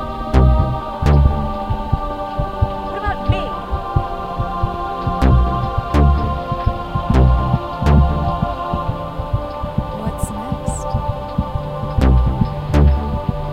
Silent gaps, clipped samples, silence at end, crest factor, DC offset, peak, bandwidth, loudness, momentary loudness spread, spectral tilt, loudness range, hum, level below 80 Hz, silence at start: none; under 0.1%; 0 s; 16 dB; under 0.1%; 0 dBFS; 10.5 kHz; -19 LUFS; 9 LU; -7.5 dB/octave; 5 LU; none; -20 dBFS; 0 s